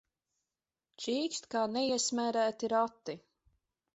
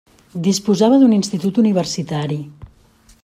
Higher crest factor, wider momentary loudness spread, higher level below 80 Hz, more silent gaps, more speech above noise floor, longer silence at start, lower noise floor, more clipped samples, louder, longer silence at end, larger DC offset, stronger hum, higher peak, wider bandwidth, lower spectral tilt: about the same, 18 dB vs 16 dB; about the same, 13 LU vs 14 LU; second, -78 dBFS vs -52 dBFS; neither; first, over 57 dB vs 35 dB; first, 1 s vs 0.35 s; first, under -90 dBFS vs -51 dBFS; neither; second, -33 LUFS vs -16 LUFS; first, 0.75 s vs 0.55 s; neither; neither; second, -18 dBFS vs -2 dBFS; second, 8 kHz vs 14 kHz; second, -2 dB/octave vs -6 dB/octave